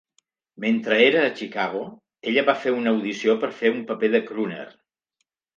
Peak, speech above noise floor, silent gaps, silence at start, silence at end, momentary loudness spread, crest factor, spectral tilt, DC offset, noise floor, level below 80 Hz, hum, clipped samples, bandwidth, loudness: -4 dBFS; 55 dB; none; 0.6 s; 0.85 s; 14 LU; 20 dB; -5 dB/octave; under 0.1%; -77 dBFS; -76 dBFS; none; under 0.1%; 7.4 kHz; -22 LUFS